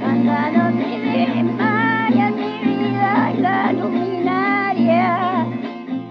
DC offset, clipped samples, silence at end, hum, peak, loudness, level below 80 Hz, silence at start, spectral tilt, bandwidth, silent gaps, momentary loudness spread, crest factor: under 0.1%; under 0.1%; 0 s; none; -6 dBFS; -18 LUFS; -78 dBFS; 0 s; -8.5 dB/octave; 5.8 kHz; none; 5 LU; 12 dB